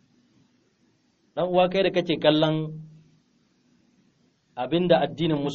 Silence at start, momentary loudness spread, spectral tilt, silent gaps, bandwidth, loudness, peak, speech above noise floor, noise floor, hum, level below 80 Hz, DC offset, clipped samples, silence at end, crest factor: 1.35 s; 15 LU; -4.5 dB/octave; none; 7 kHz; -23 LUFS; -6 dBFS; 43 dB; -66 dBFS; none; -60 dBFS; under 0.1%; under 0.1%; 0 s; 22 dB